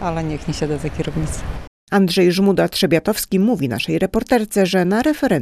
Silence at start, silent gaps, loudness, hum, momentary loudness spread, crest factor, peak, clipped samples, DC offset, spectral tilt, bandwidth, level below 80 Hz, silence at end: 0 s; 1.67-1.87 s; -18 LUFS; none; 9 LU; 16 dB; -2 dBFS; under 0.1%; under 0.1%; -5.5 dB/octave; 14.5 kHz; -36 dBFS; 0 s